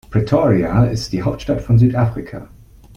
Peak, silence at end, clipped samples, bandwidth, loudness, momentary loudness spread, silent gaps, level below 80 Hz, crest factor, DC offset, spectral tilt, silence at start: -2 dBFS; 0.5 s; under 0.1%; 7.6 kHz; -16 LUFS; 13 LU; none; -36 dBFS; 16 dB; under 0.1%; -8 dB/octave; 0.1 s